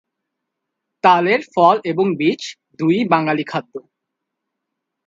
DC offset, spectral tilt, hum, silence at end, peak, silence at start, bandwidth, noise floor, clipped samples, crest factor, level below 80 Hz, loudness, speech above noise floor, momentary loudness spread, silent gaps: under 0.1%; -6 dB/octave; none; 1.25 s; 0 dBFS; 1.05 s; 7.8 kHz; -79 dBFS; under 0.1%; 18 dB; -68 dBFS; -17 LUFS; 63 dB; 13 LU; none